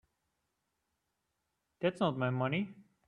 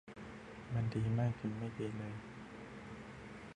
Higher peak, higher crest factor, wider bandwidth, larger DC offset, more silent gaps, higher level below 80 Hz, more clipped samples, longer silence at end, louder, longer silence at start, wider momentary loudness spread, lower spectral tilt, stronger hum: first, -16 dBFS vs -24 dBFS; about the same, 22 dB vs 18 dB; about the same, 10.5 kHz vs 9.8 kHz; neither; neither; second, -76 dBFS vs -62 dBFS; neither; first, 0.25 s vs 0 s; first, -35 LUFS vs -42 LUFS; first, 1.8 s vs 0.05 s; second, 5 LU vs 15 LU; about the same, -8 dB/octave vs -8 dB/octave; neither